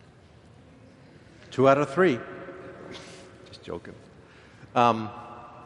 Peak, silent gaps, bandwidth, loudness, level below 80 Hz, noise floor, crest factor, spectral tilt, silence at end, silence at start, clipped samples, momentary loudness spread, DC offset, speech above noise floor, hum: -4 dBFS; none; 11 kHz; -24 LUFS; -64 dBFS; -53 dBFS; 24 dB; -6.5 dB/octave; 0.05 s; 1.5 s; under 0.1%; 24 LU; under 0.1%; 30 dB; none